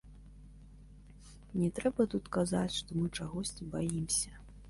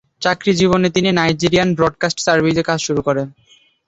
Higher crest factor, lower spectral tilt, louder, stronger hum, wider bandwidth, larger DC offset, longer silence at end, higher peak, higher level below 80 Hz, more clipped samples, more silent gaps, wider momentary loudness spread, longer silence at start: about the same, 18 dB vs 16 dB; about the same, -5 dB/octave vs -5 dB/octave; second, -35 LUFS vs -16 LUFS; first, 50 Hz at -50 dBFS vs none; first, 11.5 kHz vs 8.2 kHz; neither; second, 0 s vs 0.55 s; second, -18 dBFS vs 0 dBFS; second, -54 dBFS vs -46 dBFS; neither; neither; about the same, 7 LU vs 5 LU; second, 0.05 s vs 0.2 s